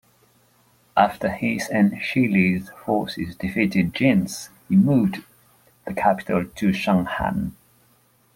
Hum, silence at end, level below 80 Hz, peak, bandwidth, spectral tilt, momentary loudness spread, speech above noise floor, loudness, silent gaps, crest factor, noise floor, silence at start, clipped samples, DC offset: none; 0.85 s; -50 dBFS; -2 dBFS; 16 kHz; -6.5 dB/octave; 10 LU; 39 dB; -22 LUFS; none; 20 dB; -60 dBFS; 0.95 s; under 0.1%; under 0.1%